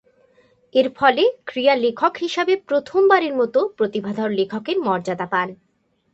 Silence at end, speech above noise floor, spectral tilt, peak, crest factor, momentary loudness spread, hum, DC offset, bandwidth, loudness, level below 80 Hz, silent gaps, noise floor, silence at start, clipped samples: 0.6 s; 38 dB; -5.5 dB/octave; 0 dBFS; 20 dB; 7 LU; none; under 0.1%; 8 kHz; -20 LUFS; -66 dBFS; none; -57 dBFS; 0.75 s; under 0.1%